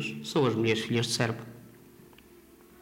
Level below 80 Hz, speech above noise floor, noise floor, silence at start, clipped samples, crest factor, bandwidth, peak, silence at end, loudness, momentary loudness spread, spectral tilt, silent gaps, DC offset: -66 dBFS; 28 dB; -55 dBFS; 0 s; under 0.1%; 20 dB; 16 kHz; -12 dBFS; 0.4 s; -28 LUFS; 11 LU; -5 dB/octave; none; under 0.1%